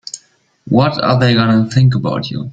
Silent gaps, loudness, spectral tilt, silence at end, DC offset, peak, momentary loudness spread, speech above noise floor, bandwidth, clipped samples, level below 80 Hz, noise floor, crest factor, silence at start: none; -13 LUFS; -6.5 dB/octave; 0 s; under 0.1%; 0 dBFS; 10 LU; 41 dB; 9.2 kHz; under 0.1%; -46 dBFS; -53 dBFS; 14 dB; 0.15 s